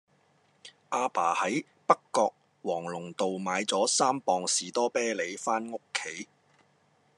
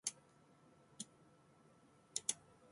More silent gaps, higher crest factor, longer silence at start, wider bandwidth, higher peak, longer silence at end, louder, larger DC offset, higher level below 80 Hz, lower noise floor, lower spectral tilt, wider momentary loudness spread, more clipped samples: neither; second, 26 dB vs 34 dB; first, 0.65 s vs 0.05 s; about the same, 12.5 kHz vs 11.5 kHz; first, -6 dBFS vs -18 dBFS; first, 0.95 s vs 0.35 s; first, -29 LUFS vs -46 LUFS; neither; about the same, -90 dBFS vs -88 dBFS; about the same, -67 dBFS vs -69 dBFS; first, -2.5 dB/octave vs 0 dB/octave; second, 9 LU vs 27 LU; neither